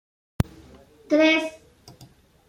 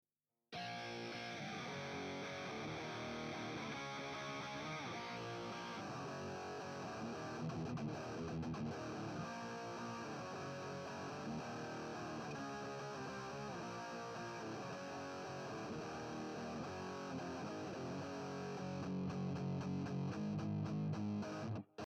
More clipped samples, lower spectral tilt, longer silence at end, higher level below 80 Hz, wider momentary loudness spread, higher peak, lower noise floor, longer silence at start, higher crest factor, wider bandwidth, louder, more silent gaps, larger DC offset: neither; about the same, -5.5 dB/octave vs -5.5 dB/octave; first, 0.45 s vs 0.05 s; first, -46 dBFS vs -72 dBFS; first, 11 LU vs 5 LU; first, -4 dBFS vs -32 dBFS; second, -52 dBFS vs -70 dBFS; about the same, 0.4 s vs 0.5 s; first, 22 dB vs 14 dB; about the same, 16 kHz vs 15 kHz; first, -23 LUFS vs -46 LUFS; neither; neither